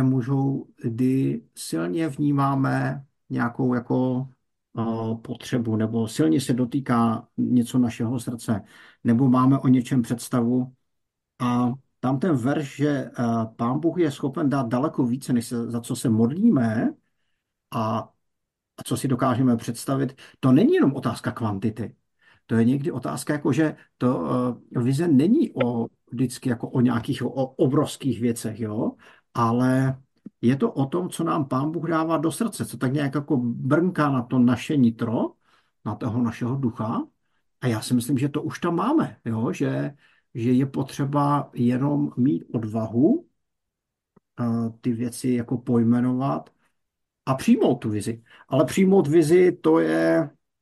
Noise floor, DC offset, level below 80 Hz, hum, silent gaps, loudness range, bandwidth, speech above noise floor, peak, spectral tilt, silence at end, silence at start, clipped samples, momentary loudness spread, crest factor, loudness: -83 dBFS; under 0.1%; -64 dBFS; none; none; 3 LU; 12.5 kHz; 61 dB; -6 dBFS; -7 dB/octave; 0.35 s; 0 s; under 0.1%; 10 LU; 16 dB; -24 LUFS